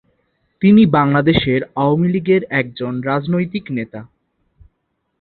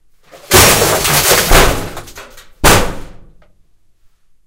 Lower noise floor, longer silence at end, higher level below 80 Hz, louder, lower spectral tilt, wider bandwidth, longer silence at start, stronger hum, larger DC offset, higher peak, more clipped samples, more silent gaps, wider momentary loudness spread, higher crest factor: first, -70 dBFS vs -48 dBFS; second, 1.15 s vs 1.3 s; second, -46 dBFS vs -22 dBFS; second, -16 LUFS vs -9 LUFS; first, -10.5 dB/octave vs -2.5 dB/octave; second, 4.5 kHz vs over 20 kHz; first, 0.6 s vs 0.35 s; neither; neither; about the same, -2 dBFS vs 0 dBFS; second, under 0.1% vs 0.7%; neither; second, 13 LU vs 19 LU; about the same, 16 dB vs 14 dB